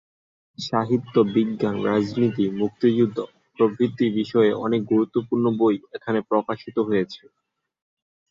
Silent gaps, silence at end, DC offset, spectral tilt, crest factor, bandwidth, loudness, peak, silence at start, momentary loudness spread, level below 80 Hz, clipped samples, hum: none; 1.15 s; under 0.1%; -8 dB/octave; 18 dB; 7.4 kHz; -22 LUFS; -6 dBFS; 0.6 s; 7 LU; -62 dBFS; under 0.1%; none